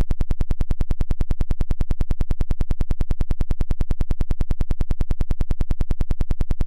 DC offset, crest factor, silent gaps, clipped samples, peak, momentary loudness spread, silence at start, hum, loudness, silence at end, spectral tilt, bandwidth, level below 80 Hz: under 0.1%; 4 dB; none; under 0.1%; -12 dBFS; 0 LU; 0 s; none; -27 LUFS; 0 s; -8 dB/octave; 3.2 kHz; -20 dBFS